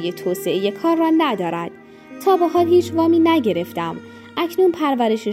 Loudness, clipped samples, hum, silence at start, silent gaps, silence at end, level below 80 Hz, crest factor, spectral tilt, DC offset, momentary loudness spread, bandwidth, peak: -18 LUFS; under 0.1%; none; 0 s; none; 0 s; -64 dBFS; 14 dB; -6 dB/octave; under 0.1%; 12 LU; 15.5 kHz; -6 dBFS